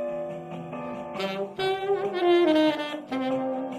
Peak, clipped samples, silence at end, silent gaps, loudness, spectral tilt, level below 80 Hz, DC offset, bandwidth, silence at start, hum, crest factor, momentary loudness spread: -12 dBFS; under 0.1%; 0 s; none; -26 LUFS; -6 dB/octave; -68 dBFS; under 0.1%; 14 kHz; 0 s; none; 14 dB; 14 LU